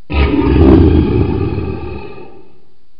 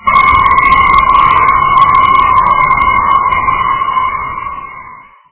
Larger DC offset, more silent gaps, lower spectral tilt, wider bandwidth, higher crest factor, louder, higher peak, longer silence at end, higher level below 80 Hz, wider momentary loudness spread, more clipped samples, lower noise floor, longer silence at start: first, 4% vs under 0.1%; neither; first, -11 dB/octave vs -7 dB/octave; first, 5.4 kHz vs 4 kHz; about the same, 12 dB vs 10 dB; second, -11 LUFS vs -8 LUFS; about the same, 0 dBFS vs 0 dBFS; first, 0.75 s vs 0.35 s; first, -18 dBFS vs -30 dBFS; first, 19 LU vs 12 LU; first, 0.4% vs under 0.1%; first, -51 dBFS vs -34 dBFS; about the same, 0.1 s vs 0.05 s